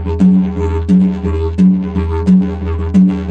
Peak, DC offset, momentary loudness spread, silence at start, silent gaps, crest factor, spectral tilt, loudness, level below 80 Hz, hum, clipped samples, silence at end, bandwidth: 0 dBFS; under 0.1%; 6 LU; 0 s; none; 10 dB; -10 dB/octave; -13 LUFS; -24 dBFS; none; under 0.1%; 0 s; 4.6 kHz